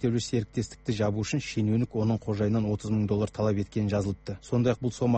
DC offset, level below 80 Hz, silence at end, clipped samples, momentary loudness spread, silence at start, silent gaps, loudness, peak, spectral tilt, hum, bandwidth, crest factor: under 0.1%; -52 dBFS; 0 s; under 0.1%; 5 LU; 0 s; none; -29 LUFS; -12 dBFS; -7 dB/octave; none; 8.4 kHz; 14 dB